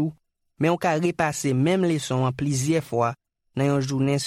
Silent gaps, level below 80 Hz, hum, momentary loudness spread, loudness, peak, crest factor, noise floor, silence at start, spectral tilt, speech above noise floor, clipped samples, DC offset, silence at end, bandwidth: none; -58 dBFS; none; 5 LU; -24 LUFS; -8 dBFS; 14 dB; -52 dBFS; 0 s; -6 dB/octave; 30 dB; under 0.1%; under 0.1%; 0 s; 15 kHz